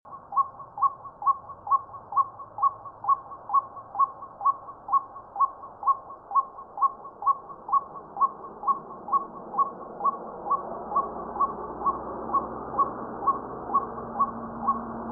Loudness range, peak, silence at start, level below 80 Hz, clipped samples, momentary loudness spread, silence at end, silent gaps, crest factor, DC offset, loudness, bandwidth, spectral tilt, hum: 2 LU; -12 dBFS; 0.05 s; -60 dBFS; under 0.1%; 4 LU; 0 s; none; 16 dB; under 0.1%; -28 LUFS; 1.8 kHz; -11.5 dB/octave; none